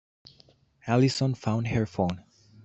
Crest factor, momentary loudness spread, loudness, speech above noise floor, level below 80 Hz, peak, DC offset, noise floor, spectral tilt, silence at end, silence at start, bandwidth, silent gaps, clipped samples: 20 dB; 11 LU; -27 LUFS; 35 dB; -56 dBFS; -10 dBFS; under 0.1%; -60 dBFS; -6.5 dB/octave; 0.45 s; 0.85 s; 8.2 kHz; none; under 0.1%